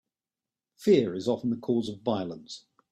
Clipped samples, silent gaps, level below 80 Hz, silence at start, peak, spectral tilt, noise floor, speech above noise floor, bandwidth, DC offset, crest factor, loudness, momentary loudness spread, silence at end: under 0.1%; none; -70 dBFS; 0.8 s; -10 dBFS; -6.5 dB/octave; under -90 dBFS; over 63 dB; 13.5 kHz; under 0.1%; 20 dB; -28 LUFS; 18 LU; 0.35 s